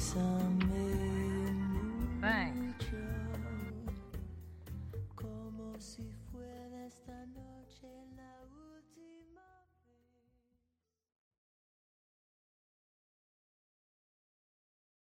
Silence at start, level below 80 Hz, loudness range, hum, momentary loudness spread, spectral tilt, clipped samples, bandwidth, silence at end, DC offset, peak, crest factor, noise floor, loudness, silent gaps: 0 s; -50 dBFS; 23 LU; none; 23 LU; -6 dB/octave; under 0.1%; 16.5 kHz; 5.6 s; under 0.1%; -18 dBFS; 22 dB; -86 dBFS; -39 LUFS; none